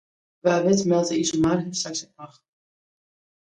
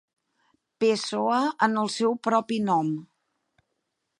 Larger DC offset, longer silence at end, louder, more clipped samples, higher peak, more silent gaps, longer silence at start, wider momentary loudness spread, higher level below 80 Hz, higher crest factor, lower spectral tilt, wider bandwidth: neither; about the same, 1.15 s vs 1.15 s; about the same, -23 LUFS vs -25 LUFS; neither; about the same, -6 dBFS vs -6 dBFS; neither; second, 0.45 s vs 0.8 s; first, 10 LU vs 3 LU; first, -56 dBFS vs -76 dBFS; about the same, 18 dB vs 20 dB; about the same, -4.5 dB/octave vs -5 dB/octave; about the same, 10.5 kHz vs 11.5 kHz